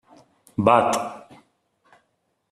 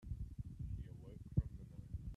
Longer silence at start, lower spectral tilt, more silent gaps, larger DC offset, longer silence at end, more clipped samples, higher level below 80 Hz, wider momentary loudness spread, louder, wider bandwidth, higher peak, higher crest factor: first, 0.6 s vs 0 s; second, -5 dB/octave vs -10 dB/octave; neither; neither; first, 1.35 s vs 0 s; neither; second, -64 dBFS vs -50 dBFS; first, 18 LU vs 11 LU; first, -21 LUFS vs -47 LUFS; first, 13.5 kHz vs 11.5 kHz; first, -2 dBFS vs -24 dBFS; about the same, 22 dB vs 22 dB